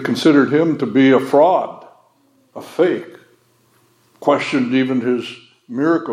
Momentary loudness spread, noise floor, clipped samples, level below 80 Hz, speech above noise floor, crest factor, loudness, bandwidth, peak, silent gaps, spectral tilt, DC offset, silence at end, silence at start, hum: 16 LU; -57 dBFS; under 0.1%; -74 dBFS; 42 dB; 16 dB; -16 LUFS; 13.5 kHz; 0 dBFS; none; -6.5 dB/octave; under 0.1%; 0 s; 0 s; none